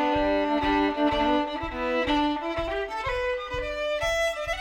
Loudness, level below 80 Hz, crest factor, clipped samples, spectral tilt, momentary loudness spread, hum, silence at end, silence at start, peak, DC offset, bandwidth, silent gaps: -26 LUFS; -42 dBFS; 14 dB; under 0.1%; -4.5 dB/octave; 6 LU; none; 0 s; 0 s; -12 dBFS; under 0.1%; 17 kHz; none